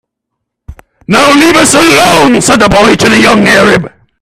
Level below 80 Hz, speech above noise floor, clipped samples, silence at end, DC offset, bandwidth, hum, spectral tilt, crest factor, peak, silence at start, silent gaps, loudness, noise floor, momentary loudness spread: -32 dBFS; 67 dB; 1%; 0.35 s; under 0.1%; over 20 kHz; none; -3.5 dB/octave; 6 dB; 0 dBFS; 0.7 s; none; -5 LUFS; -72 dBFS; 4 LU